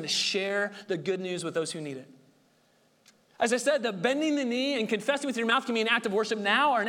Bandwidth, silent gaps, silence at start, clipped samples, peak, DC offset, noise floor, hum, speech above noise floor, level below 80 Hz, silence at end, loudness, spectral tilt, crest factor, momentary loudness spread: 17.5 kHz; none; 0 s; under 0.1%; -10 dBFS; under 0.1%; -66 dBFS; none; 38 dB; -78 dBFS; 0 s; -28 LUFS; -3 dB/octave; 20 dB; 7 LU